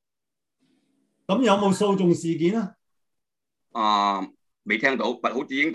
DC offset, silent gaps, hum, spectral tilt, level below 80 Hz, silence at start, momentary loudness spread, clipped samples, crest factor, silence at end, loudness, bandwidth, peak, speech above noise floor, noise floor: under 0.1%; none; none; -5.5 dB/octave; -70 dBFS; 1.3 s; 15 LU; under 0.1%; 20 dB; 0 s; -23 LUFS; 12 kHz; -6 dBFS; 66 dB; -89 dBFS